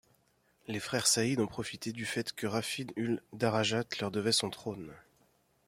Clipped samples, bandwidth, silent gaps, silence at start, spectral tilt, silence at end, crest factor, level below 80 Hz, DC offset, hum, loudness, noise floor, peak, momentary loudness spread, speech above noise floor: under 0.1%; 16.5 kHz; none; 0.7 s; -3.5 dB/octave; 0.65 s; 22 dB; -70 dBFS; under 0.1%; none; -33 LUFS; -71 dBFS; -14 dBFS; 13 LU; 38 dB